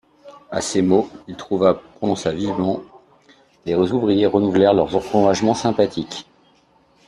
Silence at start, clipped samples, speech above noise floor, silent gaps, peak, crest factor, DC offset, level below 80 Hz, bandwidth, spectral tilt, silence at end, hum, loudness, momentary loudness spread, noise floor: 0.25 s; under 0.1%; 38 dB; none; -4 dBFS; 16 dB; under 0.1%; -54 dBFS; 11.5 kHz; -6 dB/octave; 0.85 s; none; -19 LUFS; 13 LU; -57 dBFS